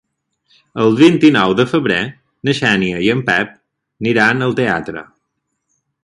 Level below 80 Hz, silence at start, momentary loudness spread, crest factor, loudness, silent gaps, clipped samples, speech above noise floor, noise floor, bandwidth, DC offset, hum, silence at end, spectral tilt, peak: -52 dBFS; 0.75 s; 14 LU; 16 dB; -14 LUFS; none; under 0.1%; 59 dB; -72 dBFS; 11 kHz; under 0.1%; none; 1 s; -6 dB/octave; 0 dBFS